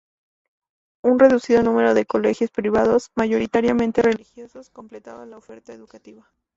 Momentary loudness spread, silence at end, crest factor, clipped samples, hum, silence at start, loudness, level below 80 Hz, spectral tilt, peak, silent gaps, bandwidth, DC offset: 10 LU; 0.45 s; 18 dB; under 0.1%; none; 1.05 s; -19 LUFS; -52 dBFS; -6 dB/octave; -2 dBFS; none; 7.8 kHz; under 0.1%